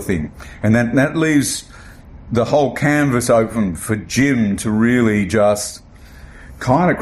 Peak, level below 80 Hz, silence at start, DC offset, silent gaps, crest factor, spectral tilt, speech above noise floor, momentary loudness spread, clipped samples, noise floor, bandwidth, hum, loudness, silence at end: -2 dBFS; -40 dBFS; 0 s; under 0.1%; none; 14 dB; -5.5 dB/octave; 23 dB; 8 LU; under 0.1%; -39 dBFS; 15 kHz; none; -17 LUFS; 0 s